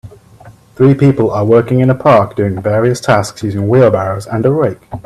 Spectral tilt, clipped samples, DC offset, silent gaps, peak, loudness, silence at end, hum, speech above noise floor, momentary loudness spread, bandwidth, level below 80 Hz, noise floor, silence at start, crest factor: -7.5 dB/octave; under 0.1%; under 0.1%; none; 0 dBFS; -12 LUFS; 0.05 s; none; 28 dB; 7 LU; 13 kHz; -44 dBFS; -39 dBFS; 0.05 s; 12 dB